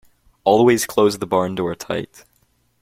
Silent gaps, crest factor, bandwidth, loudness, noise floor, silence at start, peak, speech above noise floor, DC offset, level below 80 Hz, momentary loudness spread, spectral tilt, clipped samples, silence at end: none; 18 dB; 16.5 kHz; -18 LUFS; -62 dBFS; 0.45 s; -2 dBFS; 45 dB; under 0.1%; -56 dBFS; 12 LU; -5 dB/octave; under 0.1%; 0.75 s